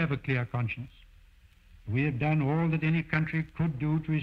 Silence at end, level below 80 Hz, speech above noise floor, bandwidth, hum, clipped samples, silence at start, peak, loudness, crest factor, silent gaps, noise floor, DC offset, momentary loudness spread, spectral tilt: 0 s; -52 dBFS; 29 dB; 5 kHz; none; under 0.1%; 0 s; -12 dBFS; -29 LUFS; 18 dB; none; -58 dBFS; under 0.1%; 8 LU; -9.5 dB/octave